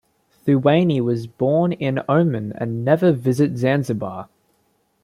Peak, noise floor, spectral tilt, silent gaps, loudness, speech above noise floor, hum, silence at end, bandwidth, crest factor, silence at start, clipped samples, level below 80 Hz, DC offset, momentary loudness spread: -2 dBFS; -65 dBFS; -8 dB/octave; none; -19 LUFS; 46 dB; none; 0.8 s; 13.5 kHz; 16 dB; 0.45 s; under 0.1%; -60 dBFS; under 0.1%; 10 LU